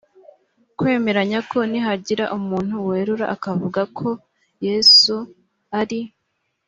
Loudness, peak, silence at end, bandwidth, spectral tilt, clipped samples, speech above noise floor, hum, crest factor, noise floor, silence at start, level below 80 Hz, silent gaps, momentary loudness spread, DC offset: -18 LUFS; -2 dBFS; 0.6 s; 7.8 kHz; -4 dB/octave; under 0.1%; 53 dB; none; 18 dB; -72 dBFS; 0.8 s; -62 dBFS; none; 18 LU; under 0.1%